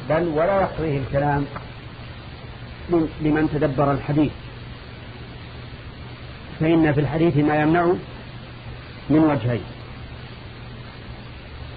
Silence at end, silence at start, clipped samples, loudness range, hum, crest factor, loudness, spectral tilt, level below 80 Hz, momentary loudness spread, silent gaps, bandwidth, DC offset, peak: 0 s; 0 s; under 0.1%; 5 LU; none; 16 dB; -21 LUFS; -11 dB/octave; -42 dBFS; 19 LU; none; 5 kHz; under 0.1%; -6 dBFS